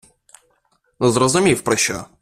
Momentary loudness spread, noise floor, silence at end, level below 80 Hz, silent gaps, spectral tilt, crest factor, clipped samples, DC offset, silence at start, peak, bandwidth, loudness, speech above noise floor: 5 LU; -64 dBFS; 0.15 s; -50 dBFS; none; -4 dB/octave; 18 dB; under 0.1%; under 0.1%; 1 s; -2 dBFS; 14.5 kHz; -17 LUFS; 47 dB